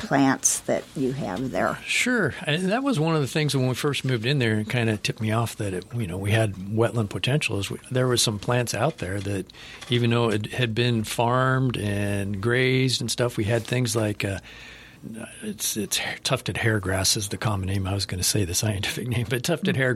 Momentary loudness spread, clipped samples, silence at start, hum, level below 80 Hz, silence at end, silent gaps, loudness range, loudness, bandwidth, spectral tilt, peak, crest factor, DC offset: 8 LU; under 0.1%; 0 s; none; -52 dBFS; 0 s; none; 3 LU; -24 LUFS; 16 kHz; -4.5 dB/octave; -6 dBFS; 18 dB; under 0.1%